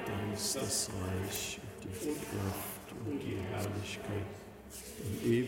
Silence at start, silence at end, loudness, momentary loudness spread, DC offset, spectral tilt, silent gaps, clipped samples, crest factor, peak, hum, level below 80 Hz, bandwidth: 0 s; 0 s; -38 LUFS; 11 LU; under 0.1%; -4 dB/octave; none; under 0.1%; 18 dB; -20 dBFS; none; -60 dBFS; 17 kHz